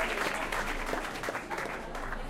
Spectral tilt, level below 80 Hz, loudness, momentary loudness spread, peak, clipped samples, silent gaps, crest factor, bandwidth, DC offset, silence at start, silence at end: -3 dB/octave; -42 dBFS; -34 LUFS; 6 LU; -16 dBFS; under 0.1%; none; 18 dB; 16.5 kHz; under 0.1%; 0 s; 0 s